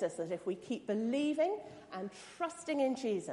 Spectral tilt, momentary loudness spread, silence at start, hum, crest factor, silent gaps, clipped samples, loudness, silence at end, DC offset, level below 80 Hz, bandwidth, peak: -5 dB/octave; 11 LU; 0 s; none; 14 dB; none; under 0.1%; -37 LUFS; 0 s; under 0.1%; -80 dBFS; 11.5 kHz; -22 dBFS